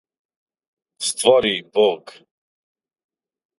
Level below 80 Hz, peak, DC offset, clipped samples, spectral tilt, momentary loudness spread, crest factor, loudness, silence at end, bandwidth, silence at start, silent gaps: -62 dBFS; 0 dBFS; under 0.1%; under 0.1%; -2 dB/octave; 10 LU; 22 dB; -18 LUFS; 1.5 s; 11.5 kHz; 1 s; none